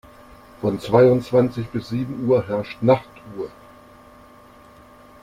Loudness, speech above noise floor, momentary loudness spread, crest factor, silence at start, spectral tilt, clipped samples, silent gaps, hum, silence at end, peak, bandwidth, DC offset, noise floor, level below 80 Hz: -20 LUFS; 28 dB; 18 LU; 20 dB; 0.6 s; -8.5 dB/octave; under 0.1%; none; none; 1.75 s; -2 dBFS; 14 kHz; under 0.1%; -47 dBFS; -52 dBFS